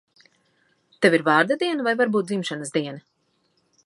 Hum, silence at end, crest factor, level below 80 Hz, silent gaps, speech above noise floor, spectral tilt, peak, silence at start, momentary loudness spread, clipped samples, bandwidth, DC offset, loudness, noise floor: none; 0.85 s; 20 dB; -76 dBFS; none; 47 dB; -5 dB/octave; -4 dBFS; 1 s; 9 LU; under 0.1%; 11.5 kHz; under 0.1%; -22 LUFS; -68 dBFS